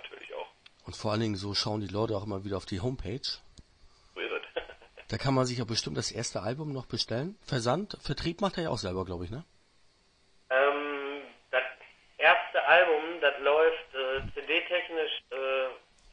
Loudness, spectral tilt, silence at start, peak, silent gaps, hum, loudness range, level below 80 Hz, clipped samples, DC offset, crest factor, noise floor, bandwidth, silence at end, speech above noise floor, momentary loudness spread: -30 LUFS; -4.5 dB/octave; 0 s; -6 dBFS; none; none; 8 LU; -56 dBFS; under 0.1%; under 0.1%; 26 dB; -65 dBFS; 10.5 kHz; 0.35 s; 33 dB; 14 LU